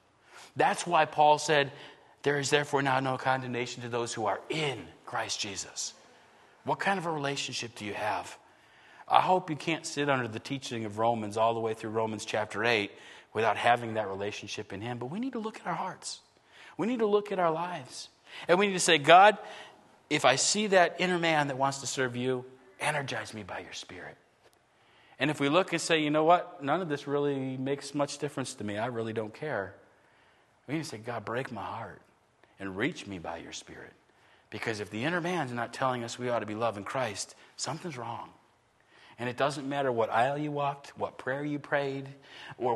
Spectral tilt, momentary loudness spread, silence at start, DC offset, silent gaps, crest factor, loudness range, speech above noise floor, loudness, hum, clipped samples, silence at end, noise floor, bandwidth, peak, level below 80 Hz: -4 dB/octave; 16 LU; 0.35 s; under 0.1%; none; 28 dB; 11 LU; 36 dB; -30 LUFS; none; under 0.1%; 0 s; -66 dBFS; 12.5 kHz; -2 dBFS; -74 dBFS